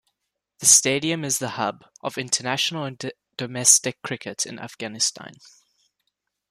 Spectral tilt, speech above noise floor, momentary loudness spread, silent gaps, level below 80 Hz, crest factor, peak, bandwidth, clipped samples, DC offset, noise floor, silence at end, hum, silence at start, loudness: -1.5 dB/octave; 56 dB; 19 LU; none; -68 dBFS; 26 dB; 0 dBFS; 15.5 kHz; under 0.1%; under 0.1%; -80 dBFS; 1.15 s; 50 Hz at -65 dBFS; 0.6 s; -21 LUFS